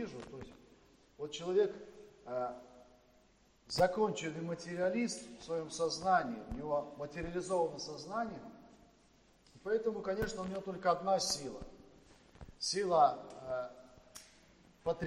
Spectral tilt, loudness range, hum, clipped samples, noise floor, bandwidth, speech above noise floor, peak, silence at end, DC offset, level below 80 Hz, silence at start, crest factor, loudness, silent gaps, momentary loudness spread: -4 dB/octave; 5 LU; none; under 0.1%; -68 dBFS; 16 kHz; 32 dB; -16 dBFS; 0 s; under 0.1%; -62 dBFS; 0 s; 22 dB; -36 LUFS; none; 20 LU